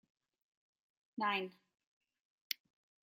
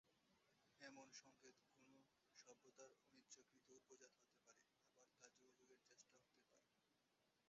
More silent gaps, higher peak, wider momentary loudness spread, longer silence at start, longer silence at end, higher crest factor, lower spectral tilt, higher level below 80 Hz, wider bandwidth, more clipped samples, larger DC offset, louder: first, 1.87-2.01 s, 2.20-2.50 s vs none; first, -16 dBFS vs -48 dBFS; first, 12 LU vs 6 LU; first, 1.15 s vs 0.05 s; first, 0.6 s vs 0 s; about the same, 30 dB vs 26 dB; first, -3 dB/octave vs -1.5 dB/octave; about the same, under -90 dBFS vs under -90 dBFS; first, 15.5 kHz vs 7.6 kHz; neither; neither; first, -41 LUFS vs -67 LUFS